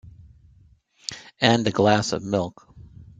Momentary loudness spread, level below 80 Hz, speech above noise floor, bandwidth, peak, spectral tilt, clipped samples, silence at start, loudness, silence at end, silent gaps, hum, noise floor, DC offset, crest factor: 16 LU; -56 dBFS; 36 dB; 9.4 kHz; -2 dBFS; -5 dB/octave; under 0.1%; 0.05 s; -22 LUFS; 0.15 s; none; none; -56 dBFS; under 0.1%; 22 dB